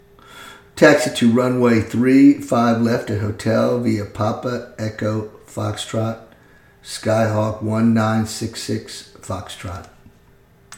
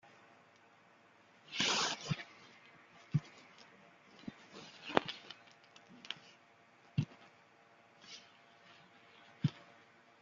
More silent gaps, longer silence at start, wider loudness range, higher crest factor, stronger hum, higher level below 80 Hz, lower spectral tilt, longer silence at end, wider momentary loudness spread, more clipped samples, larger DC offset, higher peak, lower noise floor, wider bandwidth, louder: neither; second, 0.35 s vs 1.5 s; about the same, 8 LU vs 9 LU; second, 18 dB vs 38 dB; neither; first, -52 dBFS vs -76 dBFS; first, -6 dB/octave vs -4 dB/octave; second, 0 s vs 0.6 s; second, 19 LU vs 26 LU; neither; neither; first, 0 dBFS vs -6 dBFS; second, -51 dBFS vs -65 dBFS; first, 16.5 kHz vs 9 kHz; first, -18 LUFS vs -39 LUFS